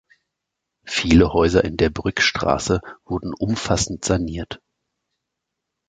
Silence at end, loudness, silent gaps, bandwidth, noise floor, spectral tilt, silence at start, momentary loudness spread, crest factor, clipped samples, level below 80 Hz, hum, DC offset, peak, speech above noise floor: 1.35 s; -20 LUFS; none; 9.4 kHz; -81 dBFS; -4.5 dB/octave; 0.85 s; 13 LU; 20 dB; under 0.1%; -36 dBFS; none; under 0.1%; 0 dBFS; 62 dB